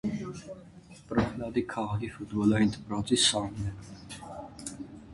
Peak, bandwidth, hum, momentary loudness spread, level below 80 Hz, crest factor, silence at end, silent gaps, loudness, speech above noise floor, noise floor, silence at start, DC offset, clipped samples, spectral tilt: -10 dBFS; 11.5 kHz; none; 20 LU; -52 dBFS; 20 dB; 0 s; none; -29 LUFS; 22 dB; -51 dBFS; 0.05 s; under 0.1%; under 0.1%; -4 dB/octave